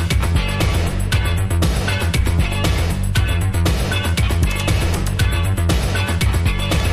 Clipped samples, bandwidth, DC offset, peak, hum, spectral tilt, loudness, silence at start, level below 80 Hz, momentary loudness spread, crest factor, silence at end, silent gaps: under 0.1%; 14.5 kHz; under 0.1%; -4 dBFS; none; -5 dB/octave; -18 LUFS; 0 s; -20 dBFS; 1 LU; 12 dB; 0 s; none